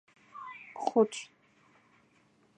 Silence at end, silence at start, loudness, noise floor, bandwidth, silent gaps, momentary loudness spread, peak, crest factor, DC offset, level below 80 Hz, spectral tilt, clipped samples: 1.35 s; 0.35 s; -31 LUFS; -67 dBFS; 10 kHz; none; 22 LU; -12 dBFS; 24 dB; under 0.1%; -88 dBFS; -4.5 dB/octave; under 0.1%